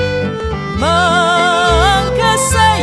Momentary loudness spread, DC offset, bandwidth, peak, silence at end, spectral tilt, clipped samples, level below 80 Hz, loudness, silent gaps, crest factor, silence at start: 8 LU; under 0.1%; 11 kHz; 0 dBFS; 0 s; -3.5 dB/octave; under 0.1%; -24 dBFS; -12 LUFS; none; 12 dB; 0 s